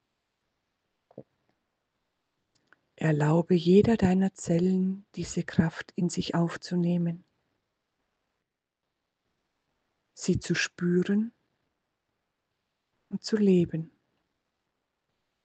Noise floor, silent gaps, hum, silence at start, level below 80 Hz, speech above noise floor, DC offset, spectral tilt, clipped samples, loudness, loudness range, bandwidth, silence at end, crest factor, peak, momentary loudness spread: -85 dBFS; none; none; 1.15 s; -58 dBFS; 59 dB; under 0.1%; -6.5 dB/octave; under 0.1%; -27 LUFS; 10 LU; 8.8 kHz; 1.6 s; 20 dB; -8 dBFS; 13 LU